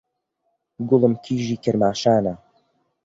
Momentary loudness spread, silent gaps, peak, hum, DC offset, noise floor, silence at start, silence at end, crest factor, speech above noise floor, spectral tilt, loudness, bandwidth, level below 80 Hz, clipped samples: 11 LU; none; -4 dBFS; none; under 0.1%; -74 dBFS; 0.8 s; 0.7 s; 20 dB; 54 dB; -6.5 dB/octave; -20 LUFS; 7.8 kHz; -58 dBFS; under 0.1%